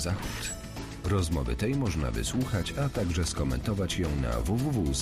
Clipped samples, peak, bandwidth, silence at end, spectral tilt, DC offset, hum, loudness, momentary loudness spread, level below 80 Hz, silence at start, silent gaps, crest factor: under 0.1%; -18 dBFS; 15.5 kHz; 0 s; -5.5 dB/octave; under 0.1%; none; -30 LUFS; 6 LU; -36 dBFS; 0 s; none; 12 dB